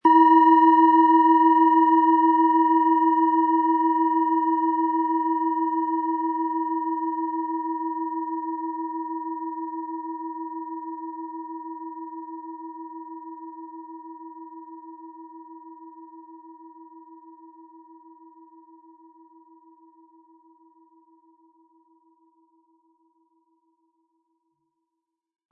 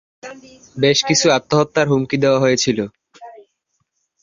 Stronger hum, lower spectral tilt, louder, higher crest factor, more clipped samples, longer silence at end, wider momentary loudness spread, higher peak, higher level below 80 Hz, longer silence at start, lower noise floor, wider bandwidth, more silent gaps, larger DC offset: neither; first, -7 dB/octave vs -4 dB/octave; second, -21 LUFS vs -16 LUFS; about the same, 18 dB vs 16 dB; neither; first, 8.05 s vs 0.9 s; first, 25 LU vs 22 LU; second, -6 dBFS vs -2 dBFS; second, under -90 dBFS vs -54 dBFS; second, 0.05 s vs 0.25 s; first, -84 dBFS vs -70 dBFS; second, 3.1 kHz vs 7.6 kHz; neither; neither